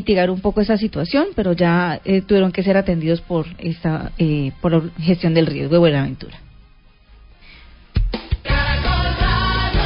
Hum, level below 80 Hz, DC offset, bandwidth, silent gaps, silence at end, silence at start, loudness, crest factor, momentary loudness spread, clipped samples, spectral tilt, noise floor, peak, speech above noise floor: none; -28 dBFS; under 0.1%; 5.4 kHz; none; 0 s; 0 s; -18 LUFS; 16 dB; 8 LU; under 0.1%; -11.5 dB/octave; -48 dBFS; -2 dBFS; 31 dB